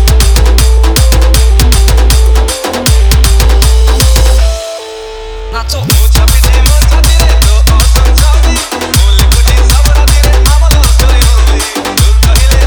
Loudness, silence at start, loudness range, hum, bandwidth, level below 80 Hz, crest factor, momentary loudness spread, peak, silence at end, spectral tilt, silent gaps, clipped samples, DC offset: -8 LUFS; 0 s; 2 LU; none; over 20 kHz; -6 dBFS; 6 dB; 6 LU; 0 dBFS; 0 s; -4 dB/octave; none; 1%; under 0.1%